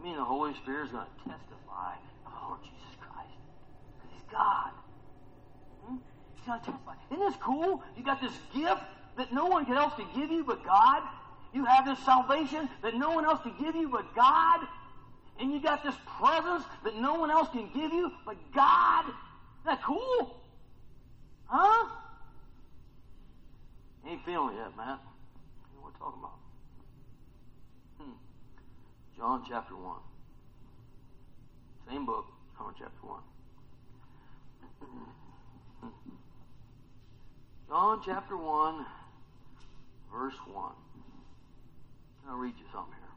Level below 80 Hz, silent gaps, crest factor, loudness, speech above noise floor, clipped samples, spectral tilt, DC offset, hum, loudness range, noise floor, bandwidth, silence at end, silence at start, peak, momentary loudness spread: -58 dBFS; none; 22 dB; -30 LUFS; 24 dB; under 0.1%; -5.5 dB/octave; under 0.1%; none; 18 LU; -54 dBFS; 8.2 kHz; 0 s; 0 s; -12 dBFS; 24 LU